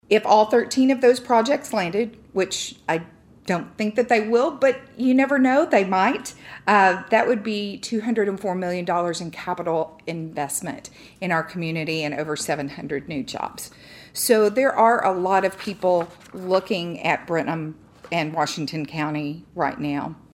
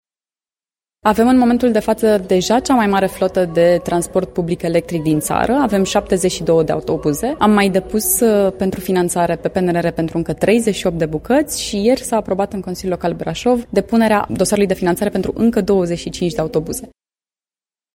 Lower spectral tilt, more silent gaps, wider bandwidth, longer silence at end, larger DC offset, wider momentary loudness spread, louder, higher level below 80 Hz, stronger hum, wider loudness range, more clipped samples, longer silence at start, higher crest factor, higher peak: about the same, -4.5 dB/octave vs -5 dB/octave; neither; about the same, 16 kHz vs 16.5 kHz; second, 0.2 s vs 1.1 s; neither; first, 13 LU vs 7 LU; second, -22 LUFS vs -16 LUFS; second, -62 dBFS vs -40 dBFS; neither; first, 7 LU vs 3 LU; neither; second, 0.1 s vs 1.05 s; about the same, 18 dB vs 16 dB; second, -4 dBFS vs 0 dBFS